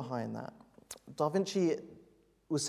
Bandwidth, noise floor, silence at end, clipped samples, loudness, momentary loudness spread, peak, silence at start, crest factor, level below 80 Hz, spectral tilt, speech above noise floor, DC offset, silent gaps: 15.5 kHz; -65 dBFS; 0 s; under 0.1%; -35 LUFS; 18 LU; -18 dBFS; 0 s; 18 dB; -74 dBFS; -5 dB/octave; 31 dB; under 0.1%; none